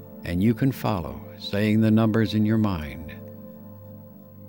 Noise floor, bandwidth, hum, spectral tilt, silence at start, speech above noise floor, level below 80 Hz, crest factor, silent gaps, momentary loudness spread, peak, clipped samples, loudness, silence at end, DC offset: -44 dBFS; 19 kHz; 50 Hz at -45 dBFS; -8 dB/octave; 0 s; 22 dB; -48 dBFS; 16 dB; none; 23 LU; -8 dBFS; under 0.1%; -23 LUFS; 0 s; under 0.1%